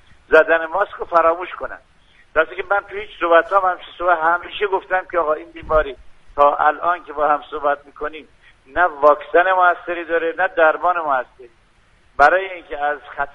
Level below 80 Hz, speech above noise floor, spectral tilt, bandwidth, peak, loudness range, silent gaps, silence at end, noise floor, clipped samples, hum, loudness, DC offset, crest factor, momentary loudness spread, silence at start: -44 dBFS; 36 dB; -5 dB/octave; 7.4 kHz; 0 dBFS; 2 LU; none; 0.05 s; -54 dBFS; under 0.1%; none; -18 LUFS; under 0.1%; 18 dB; 14 LU; 0.3 s